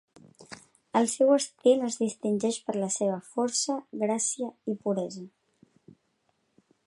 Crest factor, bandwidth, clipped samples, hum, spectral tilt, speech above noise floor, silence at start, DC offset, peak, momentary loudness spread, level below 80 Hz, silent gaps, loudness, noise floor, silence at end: 20 dB; 11.5 kHz; under 0.1%; none; -4 dB/octave; 46 dB; 0.4 s; under 0.1%; -10 dBFS; 20 LU; -78 dBFS; none; -28 LUFS; -74 dBFS; 1.6 s